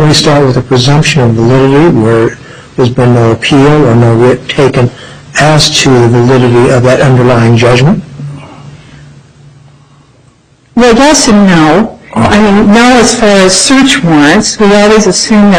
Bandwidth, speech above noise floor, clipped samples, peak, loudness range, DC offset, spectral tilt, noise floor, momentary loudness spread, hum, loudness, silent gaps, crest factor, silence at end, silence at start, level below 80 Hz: 13 kHz; 38 dB; 0.4%; 0 dBFS; 6 LU; under 0.1%; -5 dB/octave; -43 dBFS; 7 LU; none; -5 LUFS; none; 6 dB; 0 s; 0 s; -30 dBFS